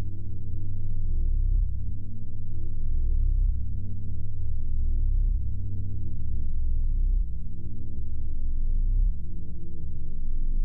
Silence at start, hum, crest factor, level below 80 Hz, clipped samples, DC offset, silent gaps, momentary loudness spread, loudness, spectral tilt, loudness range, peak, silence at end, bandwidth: 0 s; none; 8 dB; -26 dBFS; under 0.1%; under 0.1%; none; 9 LU; -33 LUFS; -13 dB/octave; 2 LU; -14 dBFS; 0 s; 0.6 kHz